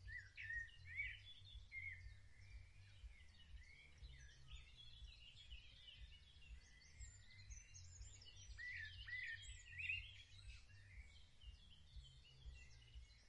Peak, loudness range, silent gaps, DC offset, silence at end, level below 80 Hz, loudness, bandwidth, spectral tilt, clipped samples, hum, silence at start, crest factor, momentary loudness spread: -34 dBFS; 10 LU; none; under 0.1%; 0 s; -64 dBFS; -56 LUFS; 10.5 kHz; -1.5 dB/octave; under 0.1%; none; 0 s; 22 dB; 15 LU